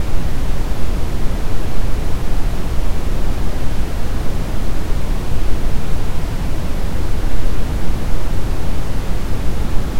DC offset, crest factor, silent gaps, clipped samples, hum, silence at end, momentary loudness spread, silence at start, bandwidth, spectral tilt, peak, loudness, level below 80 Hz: under 0.1%; 10 dB; none; under 0.1%; none; 0 s; 1 LU; 0 s; 14 kHz; -6 dB/octave; 0 dBFS; -24 LUFS; -18 dBFS